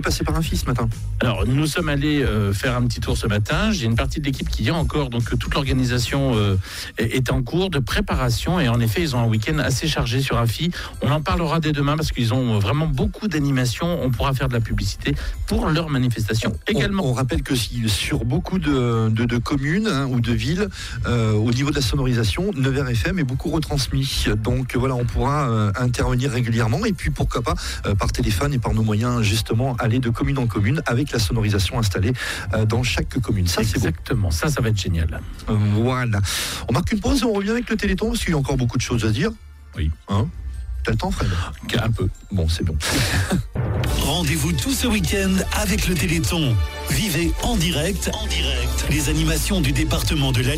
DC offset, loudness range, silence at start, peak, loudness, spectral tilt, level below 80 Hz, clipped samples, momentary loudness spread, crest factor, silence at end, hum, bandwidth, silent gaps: under 0.1%; 1 LU; 0 s; -10 dBFS; -21 LUFS; -5.5 dB/octave; -30 dBFS; under 0.1%; 4 LU; 10 dB; 0 s; none; 16 kHz; none